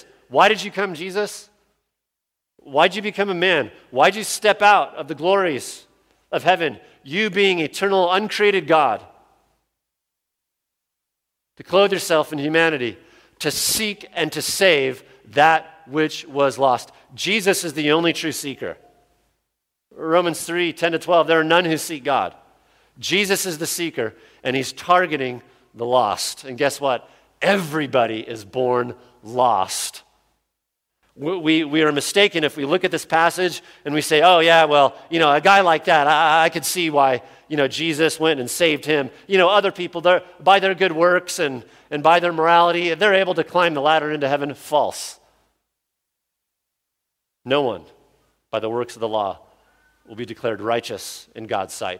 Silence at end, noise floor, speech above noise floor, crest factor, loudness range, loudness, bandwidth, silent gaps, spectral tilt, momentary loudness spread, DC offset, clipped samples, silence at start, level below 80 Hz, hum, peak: 0 s; -83 dBFS; 64 dB; 20 dB; 10 LU; -19 LUFS; 16.5 kHz; none; -3.5 dB/octave; 13 LU; under 0.1%; under 0.1%; 0.3 s; -64 dBFS; none; 0 dBFS